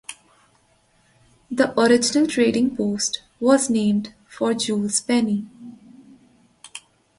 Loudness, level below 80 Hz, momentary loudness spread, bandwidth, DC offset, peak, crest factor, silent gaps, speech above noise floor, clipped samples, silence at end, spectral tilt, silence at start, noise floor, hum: -20 LUFS; -60 dBFS; 22 LU; 11.5 kHz; under 0.1%; -4 dBFS; 18 dB; none; 41 dB; under 0.1%; 0.4 s; -4 dB/octave; 0.1 s; -61 dBFS; none